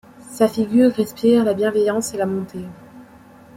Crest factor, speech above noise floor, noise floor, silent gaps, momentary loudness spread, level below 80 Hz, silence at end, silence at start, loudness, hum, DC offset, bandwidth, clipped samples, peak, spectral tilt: 18 dB; 27 dB; -45 dBFS; none; 17 LU; -58 dBFS; 0.5 s; 0.25 s; -18 LUFS; none; under 0.1%; 16 kHz; under 0.1%; -2 dBFS; -5.5 dB/octave